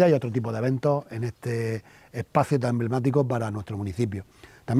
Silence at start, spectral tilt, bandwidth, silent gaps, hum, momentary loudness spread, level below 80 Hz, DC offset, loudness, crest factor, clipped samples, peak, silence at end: 0 s; -8 dB/octave; 13.5 kHz; none; none; 11 LU; -58 dBFS; under 0.1%; -27 LUFS; 18 dB; under 0.1%; -6 dBFS; 0 s